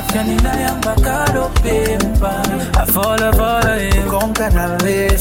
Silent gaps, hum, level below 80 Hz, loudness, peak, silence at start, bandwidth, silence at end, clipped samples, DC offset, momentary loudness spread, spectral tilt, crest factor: none; none; -18 dBFS; -15 LUFS; -2 dBFS; 0 s; 17 kHz; 0 s; under 0.1%; under 0.1%; 3 LU; -5 dB/octave; 12 dB